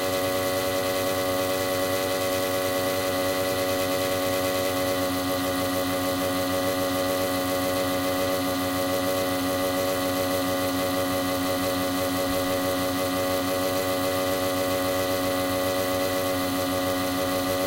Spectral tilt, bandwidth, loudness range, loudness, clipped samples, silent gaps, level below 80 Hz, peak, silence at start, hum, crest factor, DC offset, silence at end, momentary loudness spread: -3.5 dB/octave; 16 kHz; 0 LU; -25 LUFS; under 0.1%; none; -54 dBFS; -12 dBFS; 0 s; none; 14 dB; under 0.1%; 0 s; 1 LU